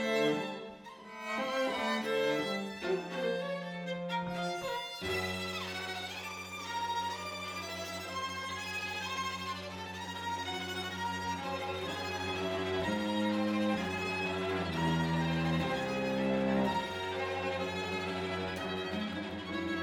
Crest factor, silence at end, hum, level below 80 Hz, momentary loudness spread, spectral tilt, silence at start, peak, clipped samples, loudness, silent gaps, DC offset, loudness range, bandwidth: 16 dB; 0 s; none; -62 dBFS; 7 LU; -5 dB/octave; 0 s; -18 dBFS; under 0.1%; -35 LUFS; none; under 0.1%; 5 LU; over 20 kHz